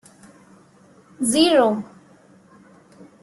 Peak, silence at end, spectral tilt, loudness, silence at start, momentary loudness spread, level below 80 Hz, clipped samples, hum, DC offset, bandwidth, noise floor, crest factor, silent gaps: -4 dBFS; 1.35 s; -3 dB/octave; -18 LUFS; 1.2 s; 15 LU; -66 dBFS; under 0.1%; none; under 0.1%; 12.5 kHz; -52 dBFS; 20 dB; none